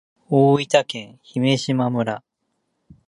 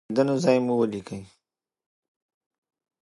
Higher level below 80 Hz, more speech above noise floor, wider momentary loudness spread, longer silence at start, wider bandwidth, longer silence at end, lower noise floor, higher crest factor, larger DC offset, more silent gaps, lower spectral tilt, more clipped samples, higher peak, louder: about the same, -64 dBFS vs -66 dBFS; second, 54 dB vs 59 dB; second, 14 LU vs 17 LU; first, 0.3 s vs 0.1 s; about the same, 11 kHz vs 11.5 kHz; second, 0.9 s vs 1.75 s; second, -73 dBFS vs -83 dBFS; about the same, 20 dB vs 20 dB; neither; neither; about the same, -6 dB/octave vs -6.5 dB/octave; neither; first, 0 dBFS vs -8 dBFS; first, -20 LUFS vs -23 LUFS